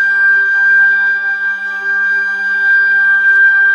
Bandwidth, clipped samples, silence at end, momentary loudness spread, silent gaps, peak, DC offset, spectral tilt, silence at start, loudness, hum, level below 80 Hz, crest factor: 6.8 kHz; under 0.1%; 0 s; 8 LU; none; -2 dBFS; under 0.1%; -1 dB/octave; 0 s; -10 LUFS; none; -88 dBFS; 8 dB